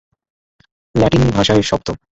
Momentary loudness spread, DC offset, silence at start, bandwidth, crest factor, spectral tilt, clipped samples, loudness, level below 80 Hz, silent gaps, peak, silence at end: 8 LU; under 0.1%; 0.95 s; 8.2 kHz; 16 dB; -6 dB/octave; under 0.1%; -15 LUFS; -34 dBFS; none; 0 dBFS; 0.2 s